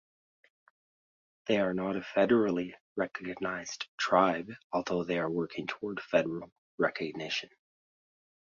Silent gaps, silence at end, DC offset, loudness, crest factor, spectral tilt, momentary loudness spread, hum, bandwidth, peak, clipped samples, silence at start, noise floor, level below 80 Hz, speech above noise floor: 2.80-2.96 s, 3.88-3.98 s, 4.64-4.70 s, 6.52-6.78 s; 1.1 s; under 0.1%; -32 LUFS; 24 dB; -5 dB/octave; 12 LU; none; 7.6 kHz; -10 dBFS; under 0.1%; 1.45 s; under -90 dBFS; -70 dBFS; over 59 dB